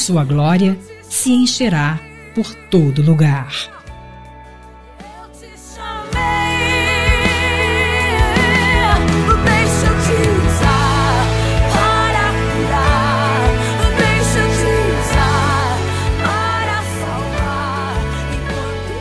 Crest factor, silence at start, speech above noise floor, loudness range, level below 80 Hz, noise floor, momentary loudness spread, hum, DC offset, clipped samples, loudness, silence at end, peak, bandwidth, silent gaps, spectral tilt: 14 dB; 0 s; 24 dB; 6 LU; -24 dBFS; -38 dBFS; 9 LU; none; under 0.1%; under 0.1%; -15 LUFS; 0 s; 0 dBFS; 11 kHz; none; -5 dB/octave